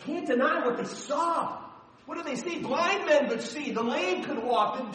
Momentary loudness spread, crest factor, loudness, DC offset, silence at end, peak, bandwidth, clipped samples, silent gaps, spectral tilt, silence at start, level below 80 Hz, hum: 11 LU; 18 dB; -28 LUFS; under 0.1%; 0 s; -12 dBFS; 10 kHz; under 0.1%; none; -4 dB/octave; 0 s; -74 dBFS; none